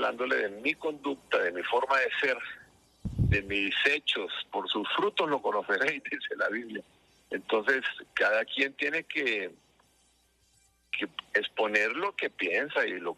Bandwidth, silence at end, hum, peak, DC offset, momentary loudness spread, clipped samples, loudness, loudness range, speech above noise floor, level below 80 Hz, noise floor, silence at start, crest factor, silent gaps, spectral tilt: 13 kHz; 0.05 s; none; -10 dBFS; under 0.1%; 10 LU; under 0.1%; -29 LUFS; 3 LU; 38 dB; -50 dBFS; -68 dBFS; 0 s; 20 dB; none; -5 dB/octave